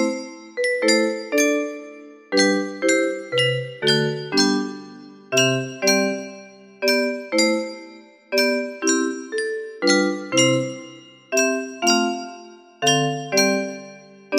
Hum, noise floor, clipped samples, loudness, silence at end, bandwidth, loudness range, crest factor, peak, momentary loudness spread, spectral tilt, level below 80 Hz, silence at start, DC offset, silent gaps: none; -44 dBFS; under 0.1%; -20 LUFS; 0 s; 15.5 kHz; 1 LU; 18 dB; -4 dBFS; 13 LU; -3 dB/octave; -70 dBFS; 0 s; under 0.1%; none